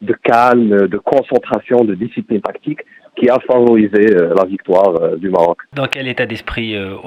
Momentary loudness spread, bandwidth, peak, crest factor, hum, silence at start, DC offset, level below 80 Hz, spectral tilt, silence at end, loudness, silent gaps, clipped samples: 11 LU; 9.8 kHz; 0 dBFS; 14 dB; none; 0 s; under 0.1%; -46 dBFS; -7.5 dB/octave; 0 s; -13 LUFS; none; under 0.1%